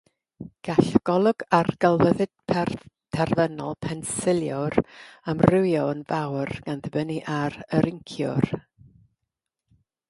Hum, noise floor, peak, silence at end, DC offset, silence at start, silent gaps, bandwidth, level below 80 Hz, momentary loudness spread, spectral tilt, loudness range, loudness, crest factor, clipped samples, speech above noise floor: none; -84 dBFS; 0 dBFS; 1.5 s; under 0.1%; 0.4 s; none; 11.5 kHz; -52 dBFS; 11 LU; -6.5 dB/octave; 5 LU; -24 LUFS; 24 dB; under 0.1%; 60 dB